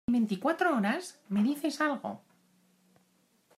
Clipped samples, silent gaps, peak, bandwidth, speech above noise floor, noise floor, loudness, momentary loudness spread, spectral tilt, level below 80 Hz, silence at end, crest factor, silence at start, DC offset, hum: under 0.1%; none; -14 dBFS; 15 kHz; 39 dB; -70 dBFS; -30 LUFS; 10 LU; -5.5 dB/octave; -68 dBFS; 1.4 s; 18 dB; 0.1 s; under 0.1%; none